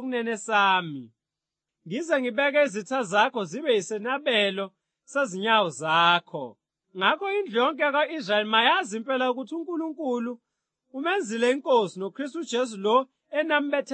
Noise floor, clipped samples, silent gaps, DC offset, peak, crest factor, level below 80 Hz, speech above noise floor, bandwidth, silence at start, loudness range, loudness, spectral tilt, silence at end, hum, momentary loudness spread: -88 dBFS; under 0.1%; none; under 0.1%; -6 dBFS; 20 dB; under -90 dBFS; 63 dB; 8.8 kHz; 0 s; 3 LU; -25 LUFS; -3.5 dB/octave; 0 s; none; 12 LU